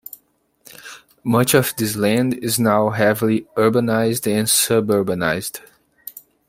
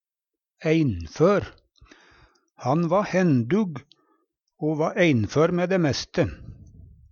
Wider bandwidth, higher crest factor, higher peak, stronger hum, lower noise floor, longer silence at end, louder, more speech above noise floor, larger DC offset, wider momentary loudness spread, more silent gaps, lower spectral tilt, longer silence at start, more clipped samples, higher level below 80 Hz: first, 16.5 kHz vs 7.2 kHz; about the same, 18 dB vs 18 dB; first, -2 dBFS vs -8 dBFS; neither; second, -61 dBFS vs -88 dBFS; about the same, 0.3 s vs 0.25 s; first, -18 LUFS vs -23 LUFS; second, 43 dB vs 66 dB; neither; first, 21 LU vs 10 LU; neither; second, -4.5 dB/octave vs -7 dB/octave; first, 0.85 s vs 0.6 s; neither; second, -58 dBFS vs -52 dBFS